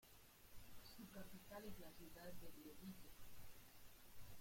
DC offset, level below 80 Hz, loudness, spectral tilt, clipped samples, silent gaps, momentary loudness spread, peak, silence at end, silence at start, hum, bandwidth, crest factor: under 0.1%; -70 dBFS; -61 LUFS; -4.5 dB/octave; under 0.1%; none; 8 LU; -42 dBFS; 0 s; 0 s; none; 16.5 kHz; 14 dB